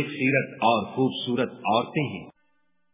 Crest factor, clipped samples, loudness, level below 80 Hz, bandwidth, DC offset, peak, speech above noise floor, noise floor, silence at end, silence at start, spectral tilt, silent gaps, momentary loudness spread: 18 dB; under 0.1%; -25 LUFS; -66 dBFS; 3.8 kHz; under 0.1%; -8 dBFS; 49 dB; -74 dBFS; 0.65 s; 0 s; -10 dB/octave; none; 6 LU